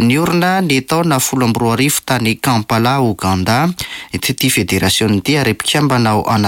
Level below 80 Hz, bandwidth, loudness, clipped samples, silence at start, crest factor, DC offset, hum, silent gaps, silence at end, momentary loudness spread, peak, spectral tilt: -42 dBFS; 17 kHz; -14 LUFS; under 0.1%; 0 s; 10 dB; under 0.1%; none; none; 0 s; 3 LU; -4 dBFS; -4.5 dB/octave